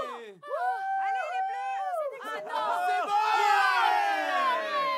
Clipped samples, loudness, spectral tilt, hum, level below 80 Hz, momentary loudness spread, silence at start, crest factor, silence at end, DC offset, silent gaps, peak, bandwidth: under 0.1%; -28 LUFS; -0.5 dB/octave; none; under -90 dBFS; 11 LU; 0 s; 16 dB; 0 s; under 0.1%; none; -12 dBFS; 16 kHz